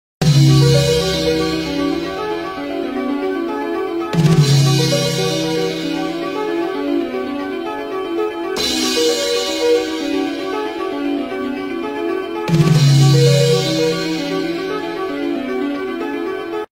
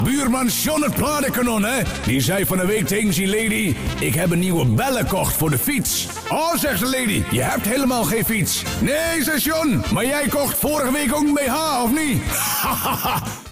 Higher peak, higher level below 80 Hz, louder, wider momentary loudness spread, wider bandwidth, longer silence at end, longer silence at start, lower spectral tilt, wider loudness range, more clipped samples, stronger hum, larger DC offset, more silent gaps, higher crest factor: first, -2 dBFS vs -10 dBFS; about the same, -42 dBFS vs -38 dBFS; about the same, -17 LUFS vs -19 LUFS; first, 11 LU vs 2 LU; about the same, 16 kHz vs 16 kHz; about the same, 0.05 s vs 0 s; first, 0.2 s vs 0 s; first, -5.5 dB/octave vs -4 dB/octave; first, 5 LU vs 1 LU; neither; neither; neither; neither; first, 16 dB vs 10 dB